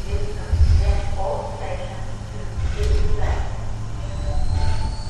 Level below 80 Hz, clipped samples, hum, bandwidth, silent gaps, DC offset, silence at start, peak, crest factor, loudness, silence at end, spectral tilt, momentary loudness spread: -22 dBFS; under 0.1%; none; 10.5 kHz; none; under 0.1%; 0 s; -6 dBFS; 14 dB; -25 LUFS; 0 s; -6.5 dB/octave; 12 LU